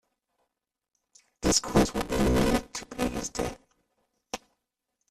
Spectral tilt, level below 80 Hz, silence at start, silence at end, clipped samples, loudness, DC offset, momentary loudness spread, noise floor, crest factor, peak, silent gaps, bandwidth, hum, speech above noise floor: -4 dB/octave; -42 dBFS; 1.4 s; 0.75 s; under 0.1%; -27 LUFS; under 0.1%; 17 LU; -86 dBFS; 22 dB; -8 dBFS; none; 15 kHz; none; 61 dB